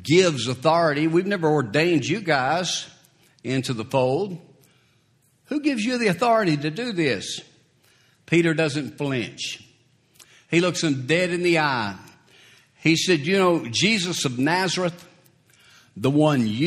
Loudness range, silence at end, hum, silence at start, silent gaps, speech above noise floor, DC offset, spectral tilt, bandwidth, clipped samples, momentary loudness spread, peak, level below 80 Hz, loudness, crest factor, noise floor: 4 LU; 0 s; none; 0 s; none; 41 dB; under 0.1%; -4.5 dB/octave; 14.5 kHz; under 0.1%; 9 LU; -4 dBFS; -64 dBFS; -22 LUFS; 18 dB; -63 dBFS